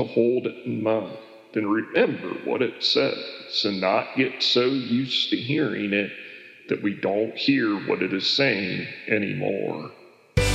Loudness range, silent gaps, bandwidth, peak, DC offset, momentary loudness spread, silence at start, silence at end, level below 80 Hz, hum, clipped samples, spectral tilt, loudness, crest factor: 2 LU; none; 14 kHz; -6 dBFS; under 0.1%; 11 LU; 0 s; 0 s; -44 dBFS; none; under 0.1%; -5 dB/octave; -24 LUFS; 18 dB